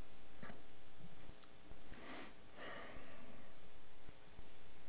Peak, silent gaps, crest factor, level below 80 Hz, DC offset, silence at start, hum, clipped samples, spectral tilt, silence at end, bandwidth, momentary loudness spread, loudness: -34 dBFS; none; 12 dB; -68 dBFS; 0.8%; 0 s; none; under 0.1%; -3.5 dB/octave; 0 s; 4 kHz; 10 LU; -59 LUFS